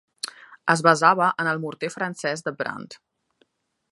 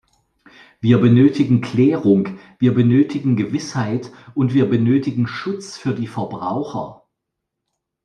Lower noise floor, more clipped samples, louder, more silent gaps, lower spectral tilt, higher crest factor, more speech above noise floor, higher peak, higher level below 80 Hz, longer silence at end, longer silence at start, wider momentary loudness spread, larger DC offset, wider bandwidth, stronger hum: second, -67 dBFS vs -79 dBFS; neither; second, -22 LUFS vs -18 LUFS; neither; second, -4 dB/octave vs -8 dB/octave; first, 24 dB vs 16 dB; second, 44 dB vs 62 dB; about the same, 0 dBFS vs -2 dBFS; second, -74 dBFS vs -58 dBFS; second, 0.95 s vs 1.1 s; second, 0.25 s vs 0.85 s; first, 17 LU vs 13 LU; neither; first, 11.5 kHz vs 9.4 kHz; neither